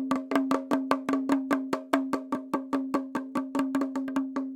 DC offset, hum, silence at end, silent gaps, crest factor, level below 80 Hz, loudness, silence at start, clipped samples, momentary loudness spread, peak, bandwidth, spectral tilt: under 0.1%; none; 0 s; none; 22 dB; -70 dBFS; -29 LUFS; 0 s; under 0.1%; 5 LU; -6 dBFS; 16.5 kHz; -5 dB/octave